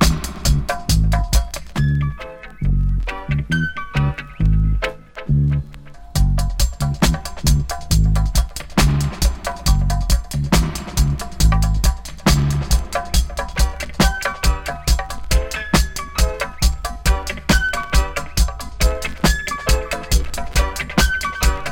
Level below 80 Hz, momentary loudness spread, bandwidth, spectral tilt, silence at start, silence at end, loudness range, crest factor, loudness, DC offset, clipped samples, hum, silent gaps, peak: -20 dBFS; 5 LU; 17 kHz; -4.5 dB/octave; 0 s; 0 s; 2 LU; 18 dB; -20 LUFS; under 0.1%; under 0.1%; none; none; 0 dBFS